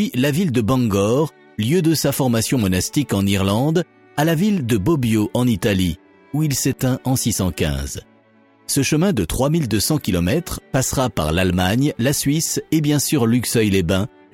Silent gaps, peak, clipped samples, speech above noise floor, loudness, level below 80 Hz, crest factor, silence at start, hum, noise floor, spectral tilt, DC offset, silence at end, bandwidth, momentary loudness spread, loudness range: none; -4 dBFS; under 0.1%; 35 dB; -19 LUFS; -38 dBFS; 14 dB; 0 s; none; -53 dBFS; -5 dB/octave; under 0.1%; 0.25 s; 17.5 kHz; 5 LU; 2 LU